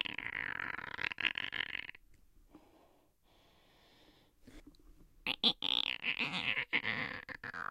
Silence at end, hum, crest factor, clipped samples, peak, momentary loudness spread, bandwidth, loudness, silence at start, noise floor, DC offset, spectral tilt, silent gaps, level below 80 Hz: 0.05 s; none; 28 dB; under 0.1%; -12 dBFS; 11 LU; 16.5 kHz; -36 LUFS; 0 s; -69 dBFS; under 0.1%; -3 dB/octave; none; -66 dBFS